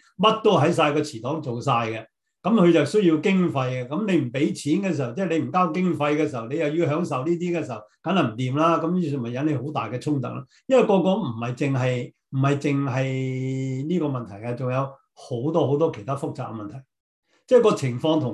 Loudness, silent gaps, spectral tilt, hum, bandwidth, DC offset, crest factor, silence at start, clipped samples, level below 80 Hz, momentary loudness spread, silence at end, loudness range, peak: -23 LUFS; 17.00-17.23 s; -7 dB/octave; none; 11.5 kHz; under 0.1%; 18 dB; 0.2 s; under 0.1%; -66 dBFS; 11 LU; 0 s; 4 LU; -4 dBFS